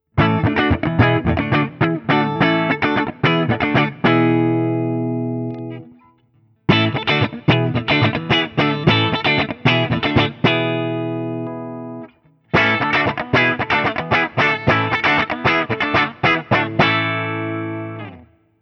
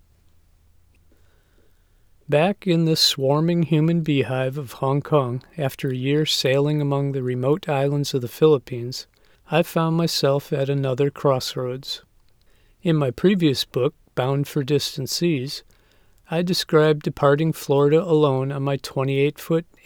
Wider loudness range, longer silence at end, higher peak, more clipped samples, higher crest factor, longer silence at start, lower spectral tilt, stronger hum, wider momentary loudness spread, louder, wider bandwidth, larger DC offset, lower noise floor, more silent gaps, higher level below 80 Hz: about the same, 3 LU vs 3 LU; first, 0.4 s vs 0.25 s; first, 0 dBFS vs -4 dBFS; neither; about the same, 18 dB vs 18 dB; second, 0.15 s vs 2.3 s; about the same, -7 dB/octave vs -6 dB/octave; neither; about the same, 10 LU vs 9 LU; first, -17 LUFS vs -21 LUFS; second, 6.6 kHz vs 18 kHz; neither; about the same, -57 dBFS vs -57 dBFS; neither; first, -42 dBFS vs -58 dBFS